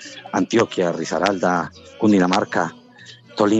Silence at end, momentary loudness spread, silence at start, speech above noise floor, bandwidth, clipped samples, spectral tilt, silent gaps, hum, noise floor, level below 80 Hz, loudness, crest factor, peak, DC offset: 0 s; 9 LU; 0 s; 25 dB; 8.4 kHz; under 0.1%; -5.5 dB/octave; none; none; -44 dBFS; -64 dBFS; -20 LUFS; 18 dB; -2 dBFS; under 0.1%